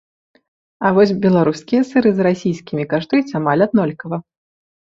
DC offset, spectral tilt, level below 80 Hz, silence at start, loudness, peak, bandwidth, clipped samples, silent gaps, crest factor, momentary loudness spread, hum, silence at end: under 0.1%; -7.5 dB/octave; -58 dBFS; 0.8 s; -17 LUFS; -2 dBFS; 7.6 kHz; under 0.1%; none; 16 dB; 9 LU; none; 0.75 s